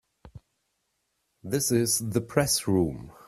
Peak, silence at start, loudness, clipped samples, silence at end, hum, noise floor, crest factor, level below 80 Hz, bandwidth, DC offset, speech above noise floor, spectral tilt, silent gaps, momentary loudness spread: -8 dBFS; 0.25 s; -26 LUFS; under 0.1%; 0.15 s; none; -77 dBFS; 20 dB; -54 dBFS; 16 kHz; under 0.1%; 51 dB; -4 dB/octave; none; 7 LU